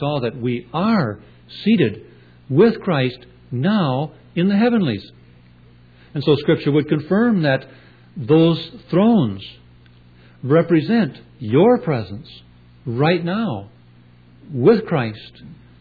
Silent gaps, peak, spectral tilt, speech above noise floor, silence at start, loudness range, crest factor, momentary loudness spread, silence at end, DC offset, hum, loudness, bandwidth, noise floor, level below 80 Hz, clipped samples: none; -4 dBFS; -10 dB/octave; 30 dB; 0 s; 3 LU; 16 dB; 18 LU; 0.25 s; under 0.1%; 60 Hz at -45 dBFS; -18 LUFS; 4.9 kHz; -48 dBFS; -54 dBFS; under 0.1%